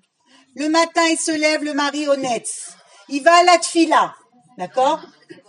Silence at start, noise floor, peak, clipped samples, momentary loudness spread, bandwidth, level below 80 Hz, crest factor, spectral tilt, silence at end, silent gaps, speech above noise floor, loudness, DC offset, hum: 0.55 s; -55 dBFS; 0 dBFS; under 0.1%; 15 LU; 11.5 kHz; -80 dBFS; 18 dB; -2 dB/octave; 0.45 s; none; 38 dB; -17 LUFS; under 0.1%; none